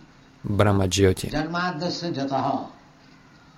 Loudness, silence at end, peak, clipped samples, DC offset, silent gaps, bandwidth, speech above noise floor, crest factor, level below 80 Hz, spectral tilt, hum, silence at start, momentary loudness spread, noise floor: -24 LUFS; 0.85 s; -6 dBFS; under 0.1%; under 0.1%; none; 16 kHz; 28 dB; 18 dB; -48 dBFS; -5.5 dB/octave; none; 0.45 s; 10 LU; -51 dBFS